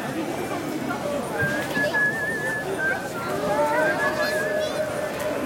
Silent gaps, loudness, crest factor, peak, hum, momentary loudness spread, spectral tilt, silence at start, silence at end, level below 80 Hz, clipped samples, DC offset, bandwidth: none; -24 LUFS; 14 dB; -10 dBFS; none; 7 LU; -4.5 dB/octave; 0 s; 0 s; -56 dBFS; under 0.1%; under 0.1%; 17 kHz